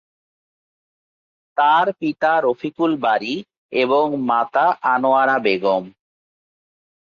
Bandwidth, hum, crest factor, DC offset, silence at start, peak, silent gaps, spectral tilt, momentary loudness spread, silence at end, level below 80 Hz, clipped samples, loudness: 7 kHz; none; 16 dB; under 0.1%; 1.55 s; -4 dBFS; 3.57-3.69 s; -6 dB/octave; 7 LU; 1.15 s; -68 dBFS; under 0.1%; -18 LUFS